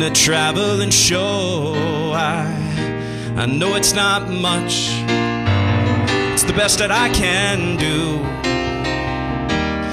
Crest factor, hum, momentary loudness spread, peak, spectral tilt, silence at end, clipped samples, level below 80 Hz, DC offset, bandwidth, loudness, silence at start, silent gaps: 14 dB; none; 8 LU; -4 dBFS; -3.5 dB/octave; 0 s; under 0.1%; -36 dBFS; under 0.1%; 16 kHz; -17 LUFS; 0 s; none